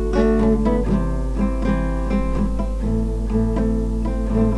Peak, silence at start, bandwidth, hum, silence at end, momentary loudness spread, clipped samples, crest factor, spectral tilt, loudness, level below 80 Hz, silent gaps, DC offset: -6 dBFS; 0 s; 11 kHz; none; 0 s; 6 LU; under 0.1%; 14 dB; -8.5 dB/octave; -21 LUFS; -22 dBFS; none; 0.7%